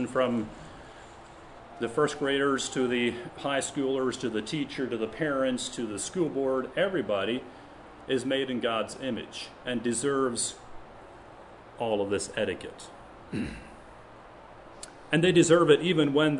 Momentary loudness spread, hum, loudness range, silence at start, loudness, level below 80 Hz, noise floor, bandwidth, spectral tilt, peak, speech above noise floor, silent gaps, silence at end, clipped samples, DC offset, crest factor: 25 LU; none; 6 LU; 0 s; -28 LUFS; -58 dBFS; -49 dBFS; 11 kHz; -4.5 dB/octave; -6 dBFS; 21 dB; none; 0 s; under 0.1%; under 0.1%; 24 dB